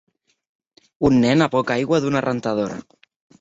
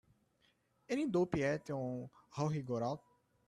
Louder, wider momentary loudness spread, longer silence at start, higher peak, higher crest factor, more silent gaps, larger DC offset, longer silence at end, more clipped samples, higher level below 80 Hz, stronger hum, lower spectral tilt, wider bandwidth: first, -19 LUFS vs -38 LUFS; about the same, 9 LU vs 11 LU; about the same, 1 s vs 0.9 s; first, -2 dBFS vs -20 dBFS; about the same, 18 dB vs 20 dB; neither; neither; about the same, 0.6 s vs 0.5 s; neither; first, -50 dBFS vs -68 dBFS; neither; about the same, -6.5 dB/octave vs -7 dB/octave; second, 8 kHz vs 12 kHz